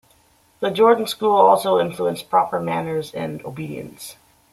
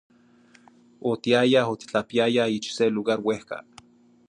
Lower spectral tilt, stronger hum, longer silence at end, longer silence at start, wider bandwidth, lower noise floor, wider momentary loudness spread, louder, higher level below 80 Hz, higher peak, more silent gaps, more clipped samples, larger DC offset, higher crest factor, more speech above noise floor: about the same, -5 dB/octave vs -5 dB/octave; neither; second, 0.4 s vs 0.65 s; second, 0.6 s vs 1.05 s; first, 15 kHz vs 11 kHz; about the same, -57 dBFS vs -56 dBFS; first, 17 LU vs 12 LU; first, -19 LUFS vs -24 LUFS; first, -62 dBFS vs -68 dBFS; first, -2 dBFS vs -6 dBFS; neither; neither; neither; about the same, 18 dB vs 20 dB; first, 38 dB vs 33 dB